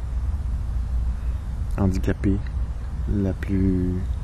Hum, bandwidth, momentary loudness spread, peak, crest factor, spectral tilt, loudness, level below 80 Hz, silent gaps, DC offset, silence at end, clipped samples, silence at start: none; 12 kHz; 7 LU; -10 dBFS; 14 dB; -9 dB/octave; -26 LUFS; -26 dBFS; none; under 0.1%; 0 s; under 0.1%; 0 s